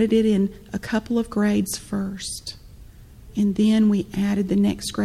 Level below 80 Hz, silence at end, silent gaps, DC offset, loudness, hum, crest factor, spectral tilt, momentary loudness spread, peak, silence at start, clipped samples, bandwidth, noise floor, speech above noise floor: -46 dBFS; 0 s; none; under 0.1%; -22 LUFS; none; 14 dB; -6 dB/octave; 12 LU; -8 dBFS; 0 s; under 0.1%; 14.5 kHz; -44 dBFS; 23 dB